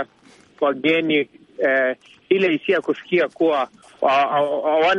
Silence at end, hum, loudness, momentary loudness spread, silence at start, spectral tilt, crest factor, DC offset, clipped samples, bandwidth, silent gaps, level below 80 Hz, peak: 0 s; none; -20 LUFS; 6 LU; 0 s; -6 dB/octave; 16 dB; under 0.1%; under 0.1%; 9.6 kHz; none; -68 dBFS; -4 dBFS